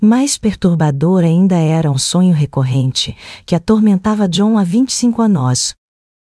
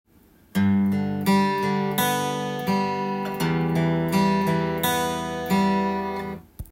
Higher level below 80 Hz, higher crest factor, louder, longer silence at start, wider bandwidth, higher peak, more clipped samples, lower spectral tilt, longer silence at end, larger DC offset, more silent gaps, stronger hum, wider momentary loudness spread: first, -44 dBFS vs -52 dBFS; about the same, 12 dB vs 14 dB; first, -13 LUFS vs -23 LUFS; second, 0 s vs 0.55 s; second, 12 kHz vs 16.5 kHz; first, 0 dBFS vs -10 dBFS; neither; about the same, -5.5 dB/octave vs -5.5 dB/octave; first, 0.6 s vs 0.05 s; neither; neither; neither; about the same, 6 LU vs 7 LU